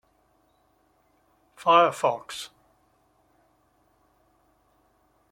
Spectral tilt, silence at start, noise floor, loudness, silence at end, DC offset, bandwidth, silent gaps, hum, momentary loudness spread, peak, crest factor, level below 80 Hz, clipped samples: -3.5 dB/octave; 1.6 s; -66 dBFS; -23 LUFS; 2.85 s; under 0.1%; 16.5 kHz; none; none; 19 LU; -4 dBFS; 26 dB; -74 dBFS; under 0.1%